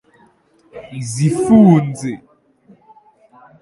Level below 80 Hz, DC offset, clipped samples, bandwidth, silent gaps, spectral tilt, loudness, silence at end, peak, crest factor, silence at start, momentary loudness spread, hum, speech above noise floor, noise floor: -52 dBFS; under 0.1%; under 0.1%; 11.5 kHz; none; -7.5 dB/octave; -14 LUFS; 1.45 s; 0 dBFS; 18 dB; 0.75 s; 23 LU; none; 40 dB; -53 dBFS